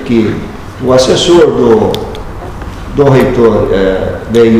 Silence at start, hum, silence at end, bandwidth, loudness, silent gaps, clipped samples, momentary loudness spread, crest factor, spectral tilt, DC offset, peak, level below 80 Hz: 0 s; none; 0 s; 15 kHz; -9 LUFS; none; 4%; 17 LU; 8 dB; -6 dB/octave; under 0.1%; 0 dBFS; -26 dBFS